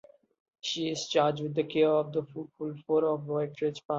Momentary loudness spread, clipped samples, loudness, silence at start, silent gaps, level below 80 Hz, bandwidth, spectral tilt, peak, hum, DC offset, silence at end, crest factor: 12 LU; under 0.1%; -30 LUFS; 0.65 s; 3.85-3.89 s; -74 dBFS; 7.8 kHz; -5 dB/octave; -12 dBFS; none; under 0.1%; 0 s; 18 dB